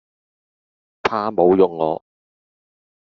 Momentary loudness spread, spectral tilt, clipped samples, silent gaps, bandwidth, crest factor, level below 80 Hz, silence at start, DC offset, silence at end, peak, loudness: 10 LU; -5 dB/octave; under 0.1%; none; 7 kHz; 20 dB; -60 dBFS; 1.05 s; under 0.1%; 1.2 s; -2 dBFS; -18 LUFS